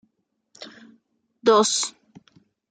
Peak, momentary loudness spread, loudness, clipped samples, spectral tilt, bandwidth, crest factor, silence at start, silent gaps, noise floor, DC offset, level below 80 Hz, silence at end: -4 dBFS; 25 LU; -20 LUFS; under 0.1%; -2 dB/octave; 9.6 kHz; 22 dB; 0.6 s; none; -73 dBFS; under 0.1%; -80 dBFS; 0.8 s